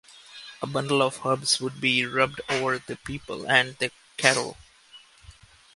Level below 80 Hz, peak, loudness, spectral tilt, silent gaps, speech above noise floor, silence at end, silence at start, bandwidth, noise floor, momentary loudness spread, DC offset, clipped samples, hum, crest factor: -60 dBFS; 0 dBFS; -25 LUFS; -3 dB/octave; none; 27 dB; 0.45 s; 0.3 s; 11.5 kHz; -53 dBFS; 14 LU; under 0.1%; under 0.1%; none; 26 dB